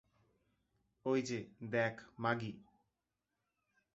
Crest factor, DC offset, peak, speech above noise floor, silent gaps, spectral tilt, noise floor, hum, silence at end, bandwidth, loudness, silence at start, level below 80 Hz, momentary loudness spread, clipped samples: 22 dB; under 0.1%; -20 dBFS; 50 dB; none; -5 dB/octave; -89 dBFS; none; 1.35 s; 8 kHz; -39 LUFS; 1.05 s; -78 dBFS; 9 LU; under 0.1%